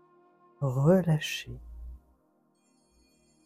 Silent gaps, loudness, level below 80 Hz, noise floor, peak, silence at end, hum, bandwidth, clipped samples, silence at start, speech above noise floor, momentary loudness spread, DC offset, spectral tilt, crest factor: none; -27 LUFS; -52 dBFS; -69 dBFS; -12 dBFS; 1.5 s; none; 15.5 kHz; under 0.1%; 0.6 s; 43 dB; 24 LU; under 0.1%; -6.5 dB/octave; 20 dB